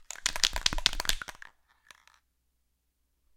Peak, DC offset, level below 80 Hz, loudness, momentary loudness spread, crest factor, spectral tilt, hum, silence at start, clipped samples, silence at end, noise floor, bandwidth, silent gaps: 0 dBFS; under 0.1%; -42 dBFS; -29 LUFS; 10 LU; 34 dB; 0 dB/octave; 60 Hz at -75 dBFS; 0 s; under 0.1%; 1.95 s; -76 dBFS; 17 kHz; none